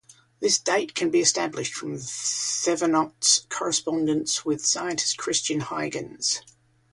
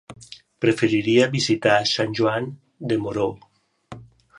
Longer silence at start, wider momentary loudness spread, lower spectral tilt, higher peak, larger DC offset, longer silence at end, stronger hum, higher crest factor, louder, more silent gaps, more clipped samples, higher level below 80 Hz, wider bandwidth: about the same, 0.1 s vs 0.1 s; second, 9 LU vs 15 LU; second, -2 dB/octave vs -5 dB/octave; about the same, -6 dBFS vs -4 dBFS; neither; about the same, 0.45 s vs 0.35 s; neither; about the same, 20 dB vs 20 dB; second, -24 LUFS vs -21 LUFS; neither; neither; second, -68 dBFS vs -58 dBFS; about the same, 11.5 kHz vs 11 kHz